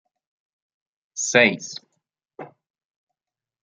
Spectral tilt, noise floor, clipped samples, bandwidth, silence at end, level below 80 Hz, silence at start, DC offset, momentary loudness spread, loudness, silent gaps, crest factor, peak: -2.5 dB/octave; under -90 dBFS; under 0.1%; 10 kHz; 1.15 s; -74 dBFS; 1.15 s; under 0.1%; 26 LU; -19 LUFS; none; 26 dB; -2 dBFS